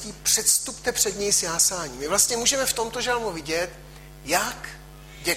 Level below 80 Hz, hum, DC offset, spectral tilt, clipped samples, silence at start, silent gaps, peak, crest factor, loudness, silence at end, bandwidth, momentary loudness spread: -48 dBFS; none; under 0.1%; -0.5 dB/octave; under 0.1%; 0 s; none; -4 dBFS; 20 dB; -22 LUFS; 0 s; 16.5 kHz; 11 LU